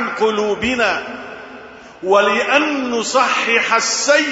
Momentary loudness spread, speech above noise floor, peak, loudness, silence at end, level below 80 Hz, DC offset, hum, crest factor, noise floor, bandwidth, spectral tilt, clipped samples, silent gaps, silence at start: 17 LU; 21 dB; 0 dBFS; -15 LUFS; 0 s; -52 dBFS; under 0.1%; none; 16 dB; -37 dBFS; 8 kHz; -2 dB/octave; under 0.1%; none; 0 s